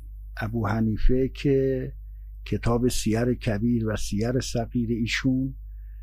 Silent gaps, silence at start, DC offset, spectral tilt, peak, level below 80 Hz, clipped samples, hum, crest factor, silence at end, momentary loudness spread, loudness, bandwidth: none; 0 s; under 0.1%; -6 dB/octave; -10 dBFS; -32 dBFS; under 0.1%; none; 16 dB; 0 s; 15 LU; -26 LUFS; 15.5 kHz